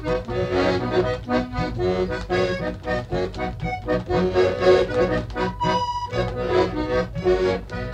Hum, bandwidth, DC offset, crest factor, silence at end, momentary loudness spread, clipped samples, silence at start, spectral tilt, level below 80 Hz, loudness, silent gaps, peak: none; 9 kHz; under 0.1%; 16 dB; 0 s; 8 LU; under 0.1%; 0 s; -6.5 dB/octave; -36 dBFS; -23 LUFS; none; -6 dBFS